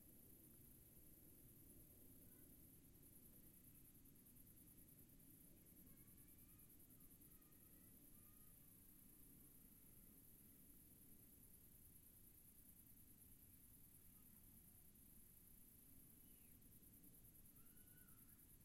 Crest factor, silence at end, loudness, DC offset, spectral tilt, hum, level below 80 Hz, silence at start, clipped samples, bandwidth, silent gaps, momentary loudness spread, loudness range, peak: 16 dB; 0 s; -67 LUFS; under 0.1%; -4 dB/octave; none; -76 dBFS; 0 s; under 0.1%; 16 kHz; none; 1 LU; 0 LU; -52 dBFS